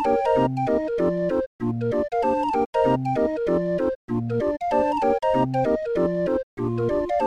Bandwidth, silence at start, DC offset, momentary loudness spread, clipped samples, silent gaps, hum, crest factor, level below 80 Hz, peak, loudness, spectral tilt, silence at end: 10.5 kHz; 0 s; under 0.1%; 5 LU; under 0.1%; 1.46-1.59 s, 2.66-2.73 s, 3.95-4.08 s, 6.43-6.57 s; none; 14 dB; -48 dBFS; -10 dBFS; -23 LUFS; -8.5 dB/octave; 0 s